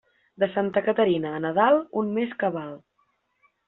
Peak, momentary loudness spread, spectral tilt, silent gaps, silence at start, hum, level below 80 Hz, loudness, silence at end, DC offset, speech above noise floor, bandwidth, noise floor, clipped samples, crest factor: -6 dBFS; 8 LU; -4.5 dB/octave; none; 0.4 s; none; -68 dBFS; -24 LUFS; 0.9 s; under 0.1%; 47 dB; 4.1 kHz; -70 dBFS; under 0.1%; 20 dB